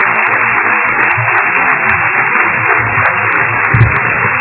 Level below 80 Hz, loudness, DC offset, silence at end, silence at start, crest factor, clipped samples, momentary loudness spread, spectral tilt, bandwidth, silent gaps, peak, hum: -32 dBFS; -9 LUFS; under 0.1%; 0 s; 0 s; 10 dB; 0.2%; 1 LU; -9 dB/octave; 4 kHz; none; 0 dBFS; none